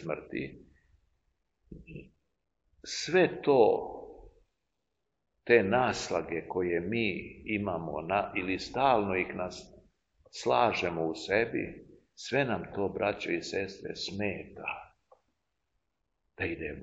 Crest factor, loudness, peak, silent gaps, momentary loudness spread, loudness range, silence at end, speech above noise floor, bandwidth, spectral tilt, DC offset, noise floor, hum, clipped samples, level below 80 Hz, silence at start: 26 dB; -31 LUFS; -8 dBFS; none; 18 LU; 6 LU; 0 s; 53 dB; 8 kHz; -5 dB/octave; under 0.1%; -84 dBFS; none; under 0.1%; -60 dBFS; 0 s